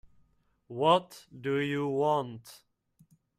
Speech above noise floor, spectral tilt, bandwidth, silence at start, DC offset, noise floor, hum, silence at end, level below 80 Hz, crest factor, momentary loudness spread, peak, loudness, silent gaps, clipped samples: 39 dB; -6 dB/octave; 15 kHz; 0.7 s; under 0.1%; -69 dBFS; none; 0.85 s; -72 dBFS; 22 dB; 19 LU; -10 dBFS; -29 LUFS; none; under 0.1%